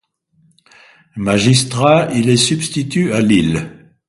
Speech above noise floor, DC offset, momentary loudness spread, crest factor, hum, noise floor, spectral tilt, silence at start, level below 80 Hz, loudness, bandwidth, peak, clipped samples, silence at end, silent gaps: 43 dB; under 0.1%; 11 LU; 16 dB; none; -57 dBFS; -5 dB/octave; 1.15 s; -44 dBFS; -14 LUFS; 11.5 kHz; 0 dBFS; under 0.1%; 0.35 s; none